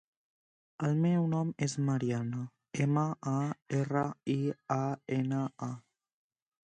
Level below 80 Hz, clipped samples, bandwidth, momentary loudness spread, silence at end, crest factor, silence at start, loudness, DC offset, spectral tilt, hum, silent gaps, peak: -72 dBFS; under 0.1%; 9.8 kHz; 9 LU; 0.95 s; 16 dB; 0.8 s; -33 LUFS; under 0.1%; -7 dB/octave; none; none; -16 dBFS